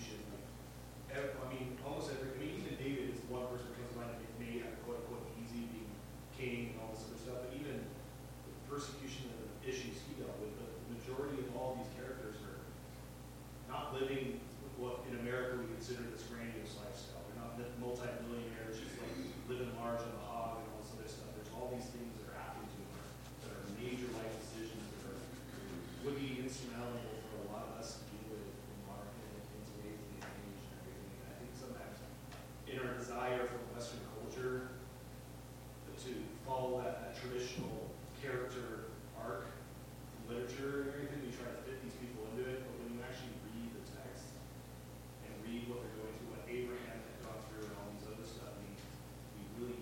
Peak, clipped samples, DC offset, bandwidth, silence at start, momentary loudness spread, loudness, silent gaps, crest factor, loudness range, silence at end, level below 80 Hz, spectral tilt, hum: -28 dBFS; under 0.1%; under 0.1%; 16.5 kHz; 0 s; 9 LU; -46 LUFS; none; 18 dB; 4 LU; 0 s; -60 dBFS; -5.5 dB/octave; 60 Hz at -55 dBFS